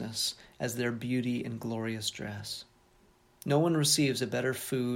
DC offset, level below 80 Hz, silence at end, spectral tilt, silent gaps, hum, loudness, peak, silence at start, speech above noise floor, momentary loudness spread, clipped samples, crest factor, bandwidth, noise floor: under 0.1%; -66 dBFS; 0 s; -4 dB/octave; none; none; -31 LUFS; -12 dBFS; 0 s; 33 dB; 14 LU; under 0.1%; 20 dB; 17 kHz; -64 dBFS